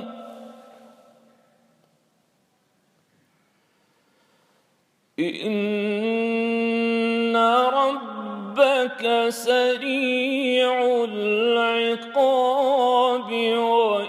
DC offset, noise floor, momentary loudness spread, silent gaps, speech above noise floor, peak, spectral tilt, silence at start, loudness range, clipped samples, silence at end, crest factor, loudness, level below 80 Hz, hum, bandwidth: under 0.1%; -67 dBFS; 10 LU; none; 45 dB; -4 dBFS; -4.5 dB/octave; 0 s; 9 LU; under 0.1%; 0 s; 18 dB; -21 LUFS; -86 dBFS; none; 14.5 kHz